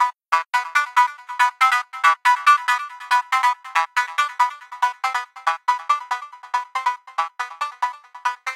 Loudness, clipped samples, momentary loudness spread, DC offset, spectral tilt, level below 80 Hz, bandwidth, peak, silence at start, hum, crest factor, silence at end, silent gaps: -21 LUFS; under 0.1%; 11 LU; under 0.1%; 5.5 dB/octave; under -90 dBFS; 16.5 kHz; -2 dBFS; 0 s; none; 18 dB; 0 s; none